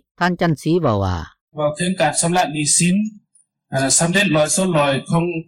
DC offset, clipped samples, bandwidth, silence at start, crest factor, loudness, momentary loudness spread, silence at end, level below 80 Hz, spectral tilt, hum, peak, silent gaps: under 0.1%; under 0.1%; 17 kHz; 0.2 s; 12 dB; -17 LUFS; 9 LU; 0.05 s; -46 dBFS; -4 dB/octave; none; -6 dBFS; 1.41-1.48 s